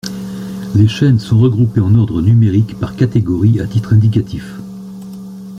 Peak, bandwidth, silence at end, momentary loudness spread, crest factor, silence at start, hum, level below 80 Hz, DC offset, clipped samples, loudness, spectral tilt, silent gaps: -2 dBFS; 7.6 kHz; 0 s; 18 LU; 10 dB; 0.05 s; none; -40 dBFS; under 0.1%; under 0.1%; -13 LUFS; -8.5 dB/octave; none